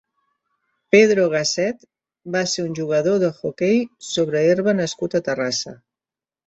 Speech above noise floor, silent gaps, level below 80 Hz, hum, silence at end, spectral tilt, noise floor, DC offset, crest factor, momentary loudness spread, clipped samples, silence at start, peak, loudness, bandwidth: over 71 dB; none; -64 dBFS; none; 0.7 s; -4.5 dB/octave; under -90 dBFS; under 0.1%; 20 dB; 10 LU; under 0.1%; 0.95 s; -2 dBFS; -20 LUFS; 8.2 kHz